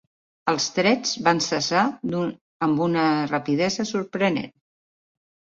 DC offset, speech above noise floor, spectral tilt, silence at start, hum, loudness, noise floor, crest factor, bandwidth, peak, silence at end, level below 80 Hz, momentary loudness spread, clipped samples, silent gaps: under 0.1%; over 68 dB; -4 dB/octave; 0.45 s; none; -23 LUFS; under -90 dBFS; 22 dB; 7.8 kHz; -2 dBFS; 1.1 s; -64 dBFS; 7 LU; under 0.1%; 2.41-2.60 s